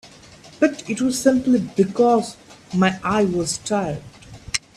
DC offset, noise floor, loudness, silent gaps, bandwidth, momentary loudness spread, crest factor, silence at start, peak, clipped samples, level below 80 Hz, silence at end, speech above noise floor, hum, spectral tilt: under 0.1%; -45 dBFS; -20 LUFS; none; 13.5 kHz; 9 LU; 18 dB; 0.05 s; -2 dBFS; under 0.1%; -52 dBFS; 0.2 s; 26 dB; none; -5 dB/octave